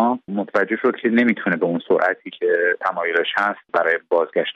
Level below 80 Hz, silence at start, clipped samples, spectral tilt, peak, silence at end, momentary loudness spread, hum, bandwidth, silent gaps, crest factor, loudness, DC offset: -68 dBFS; 0 s; under 0.1%; -7 dB/octave; -4 dBFS; 0 s; 4 LU; none; 7 kHz; none; 16 dB; -20 LUFS; under 0.1%